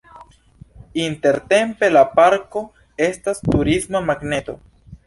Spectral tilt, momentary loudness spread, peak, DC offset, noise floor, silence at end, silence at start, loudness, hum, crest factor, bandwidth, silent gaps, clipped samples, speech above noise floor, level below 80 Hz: -5 dB/octave; 15 LU; -2 dBFS; under 0.1%; -47 dBFS; 0.1 s; 0.2 s; -18 LUFS; none; 18 dB; 11.5 kHz; none; under 0.1%; 30 dB; -42 dBFS